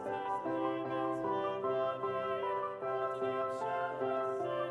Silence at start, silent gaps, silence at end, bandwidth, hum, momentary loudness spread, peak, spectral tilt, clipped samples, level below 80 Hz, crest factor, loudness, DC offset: 0 s; none; 0 s; 11 kHz; none; 2 LU; -22 dBFS; -6.5 dB/octave; under 0.1%; -76 dBFS; 14 dB; -36 LUFS; under 0.1%